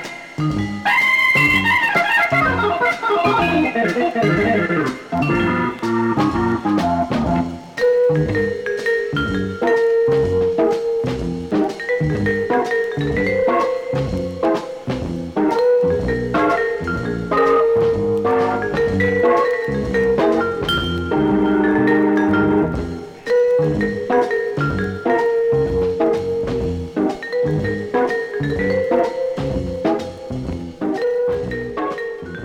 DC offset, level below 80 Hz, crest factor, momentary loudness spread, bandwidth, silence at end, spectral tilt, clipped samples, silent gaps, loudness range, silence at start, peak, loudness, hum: under 0.1%; -40 dBFS; 14 dB; 8 LU; 15.5 kHz; 0 s; -6.5 dB/octave; under 0.1%; none; 4 LU; 0 s; -4 dBFS; -18 LUFS; none